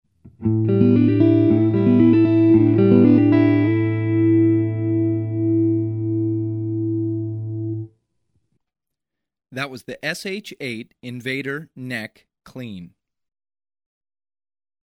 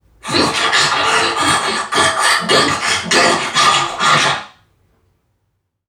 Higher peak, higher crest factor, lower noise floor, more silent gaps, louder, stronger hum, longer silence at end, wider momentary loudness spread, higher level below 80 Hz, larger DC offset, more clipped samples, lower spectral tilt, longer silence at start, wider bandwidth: about the same, -2 dBFS vs 0 dBFS; about the same, 18 dB vs 16 dB; first, -85 dBFS vs -68 dBFS; neither; second, -18 LUFS vs -13 LUFS; neither; first, 1.95 s vs 1.4 s; first, 16 LU vs 4 LU; about the same, -56 dBFS vs -52 dBFS; neither; neither; first, -8.5 dB/octave vs -1.5 dB/octave; first, 0.4 s vs 0.25 s; second, 11 kHz vs 17.5 kHz